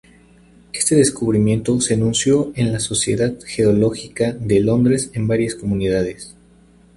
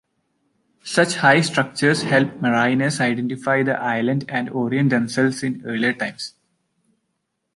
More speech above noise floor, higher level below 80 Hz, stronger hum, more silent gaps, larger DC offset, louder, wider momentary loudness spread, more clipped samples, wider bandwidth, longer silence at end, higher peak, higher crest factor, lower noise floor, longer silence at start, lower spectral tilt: second, 32 dB vs 55 dB; first, -44 dBFS vs -64 dBFS; neither; neither; neither; about the same, -18 LUFS vs -20 LUFS; about the same, 7 LU vs 9 LU; neither; about the same, 11.5 kHz vs 11.5 kHz; second, 0.65 s vs 1.25 s; about the same, -2 dBFS vs -2 dBFS; about the same, 16 dB vs 20 dB; second, -50 dBFS vs -75 dBFS; about the same, 0.75 s vs 0.85 s; about the same, -5 dB/octave vs -5 dB/octave